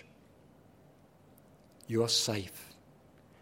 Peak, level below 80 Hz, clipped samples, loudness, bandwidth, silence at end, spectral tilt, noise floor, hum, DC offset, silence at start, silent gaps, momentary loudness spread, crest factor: -16 dBFS; -72 dBFS; under 0.1%; -31 LUFS; 16.5 kHz; 0.7 s; -3.5 dB/octave; -61 dBFS; none; under 0.1%; 1.9 s; none; 25 LU; 22 dB